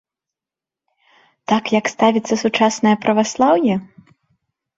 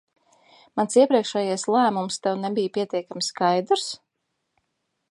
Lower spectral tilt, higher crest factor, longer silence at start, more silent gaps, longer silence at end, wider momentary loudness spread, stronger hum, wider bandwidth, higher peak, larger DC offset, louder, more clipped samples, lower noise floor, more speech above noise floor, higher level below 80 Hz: about the same, -4.5 dB/octave vs -4 dB/octave; about the same, 18 dB vs 18 dB; first, 1.5 s vs 0.75 s; neither; second, 0.95 s vs 1.15 s; second, 5 LU vs 10 LU; neither; second, 7.8 kHz vs 11.5 kHz; first, -2 dBFS vs -6 dBFS; neither; first, -17 LUFS vs -23 LUFS; neither; first, -88 dBFS vs -78 dBFS; first, 72 dB vs 55 dB; first, -60 dBFS vs -76 dBFS